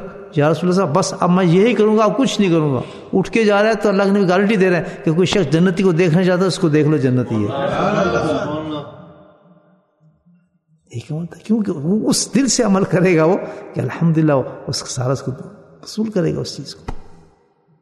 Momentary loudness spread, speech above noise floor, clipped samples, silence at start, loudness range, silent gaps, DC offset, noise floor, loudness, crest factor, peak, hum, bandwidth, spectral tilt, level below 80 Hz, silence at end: 14 LU; 43 dB; under 0.1%; 0 s; 9 LU; none; under 0.1%; -59 dBFS; -16 LUFS; 16 dB; 0 dBFS; none; 12.5 kHz; -6 dB/octave; -46 dBFS; 0.7 s